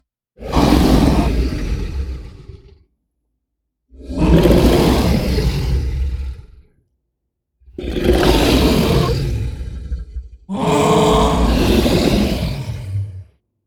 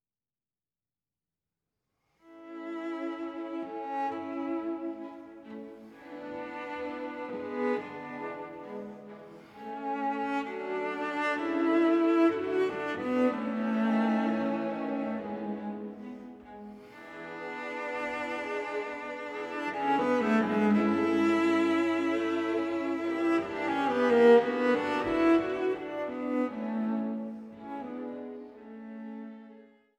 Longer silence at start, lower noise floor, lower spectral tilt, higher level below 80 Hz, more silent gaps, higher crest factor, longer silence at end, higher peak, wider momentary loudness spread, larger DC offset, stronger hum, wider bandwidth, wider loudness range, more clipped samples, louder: second, 0.4 s vs 2.25 s; second, -75 dBFS vs under -90 dBFS; about the same, -6 dB/octave vs -6.5 dB/octave; first, -22 dBFS vs -70 dBFS; neither; about the same, 16 dB vs 20 dB; about the same, 0.45 s vs 0.35 s; first, 0 dBFS vs -10 dBFS; about the same, 17 LU vs 19 LU; neither; neither; first, 18 kHz vs 8.8 kHz; second, 5 LU vs 12 LU; neither; first, -16 LUFS vs -30 LUFS